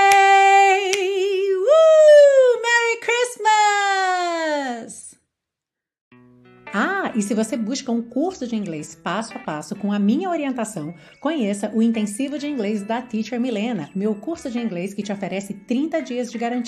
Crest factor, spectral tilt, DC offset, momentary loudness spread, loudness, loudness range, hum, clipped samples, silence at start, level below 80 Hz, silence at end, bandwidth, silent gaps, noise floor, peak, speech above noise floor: 18 dB; -4 dB/octave; under 0.1%; 16 LU; -19 LUFS; 11 LU; none; under 0.1%; 0 s; -66 dBFS; 0 s; 13 kHz; 6.01-6.11 s; -86 dBFS; -2 dBFS; 62 dB